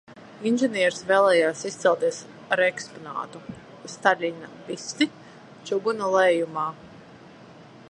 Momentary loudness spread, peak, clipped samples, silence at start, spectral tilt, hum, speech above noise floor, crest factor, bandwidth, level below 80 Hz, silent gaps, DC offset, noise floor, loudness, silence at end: 19 LU; -4 dBFS; under 0.1%; 0.1 s; -3.5 dB/octave; none; 23 dB; 22 dB; 11 kHz; -70 dBFS; none; under 0.1%; -47 dBFS; -24 LUFS; 0.3 s